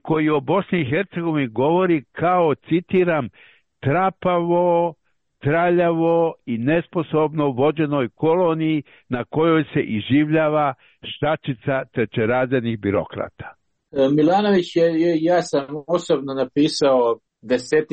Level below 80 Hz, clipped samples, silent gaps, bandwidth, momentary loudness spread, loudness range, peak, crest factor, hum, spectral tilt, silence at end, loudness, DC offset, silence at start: -56 dBFS; under 0.1%; none; 8.2 kHz; 8 LU; 2 LU; -8 dBFS; 12 dB; none; -7 dB/octave; 0.05 s; -20 LUFS; under 0.1%; 0.05 s